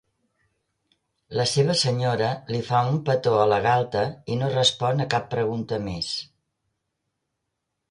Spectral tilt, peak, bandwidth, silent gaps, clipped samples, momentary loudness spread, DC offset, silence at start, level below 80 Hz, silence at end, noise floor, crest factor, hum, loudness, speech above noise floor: -5 dB/octave; -6 dBFS; 11 kHz; none; under 0.1%; 8 LU; under 0.1%; 1.3 s; -56 dBFS; 1.65 s; -80 dBFS; 20 dB; none; -23 LUFS; 57 dB